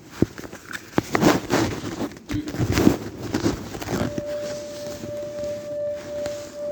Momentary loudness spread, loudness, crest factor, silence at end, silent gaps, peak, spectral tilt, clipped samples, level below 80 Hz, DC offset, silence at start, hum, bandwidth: 13 LU; -26 LUFS; 26 dB; 0 s; none; 0 dBFS; -5.5 dB/octave; under 0.1%; -44 dBFS; under 0.1%; 0 s; none; over 20 kHz